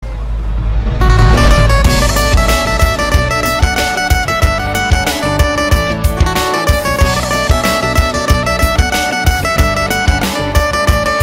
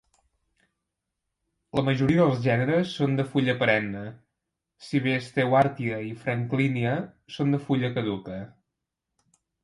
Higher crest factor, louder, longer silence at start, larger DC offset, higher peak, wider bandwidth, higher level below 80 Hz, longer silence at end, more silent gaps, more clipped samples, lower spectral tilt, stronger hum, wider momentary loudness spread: second, 12 dB vs 20 dB; first, -12 LUFS vs -25 LUFS; second, 0 s vs 1.75 s; neither; first, 0 dBFS vs -8 dBFS; first, 16.5 kHz vs 11.5 kHz; first, -16 dBFS vs -60 dBFS; second, 0 s vs 1.15 s; neither; neither; second, -4.5 dB/octave vs -7.5 dB/octave; neither; second, 4 LU vs 12 LU